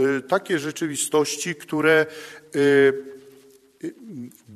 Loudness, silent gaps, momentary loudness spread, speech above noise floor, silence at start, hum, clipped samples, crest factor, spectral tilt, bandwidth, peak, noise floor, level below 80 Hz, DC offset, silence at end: -21 LUFS; none; 20 LU; 30 dB; 0 s; none; under 0.1%; 18 dB; -4 dB/octave; 13.5 kHz; -4 dBFS; -52 dBFS; -70 dBFS; under 0.1%; 0 s